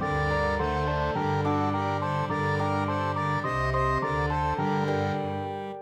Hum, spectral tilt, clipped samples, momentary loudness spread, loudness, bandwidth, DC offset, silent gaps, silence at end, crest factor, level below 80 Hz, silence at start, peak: none; -7 dB/octave; under 0.1%; 2 LU; -27 LUFS; 10 kHz; under 0.1%; none; 0 s; 14 dB; -40 dBFS; 0 s; -14 dBFS